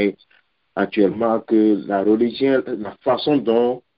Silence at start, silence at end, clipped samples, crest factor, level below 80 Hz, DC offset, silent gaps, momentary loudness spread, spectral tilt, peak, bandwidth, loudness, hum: 0 s; 0.2 s; under 0.1%; 16 dB; -60 dBFS; under 0.1%; none; 7 LU; -10.5 dB/octave; -4 dBFS; 5.2 kHz; -19 LUFS; none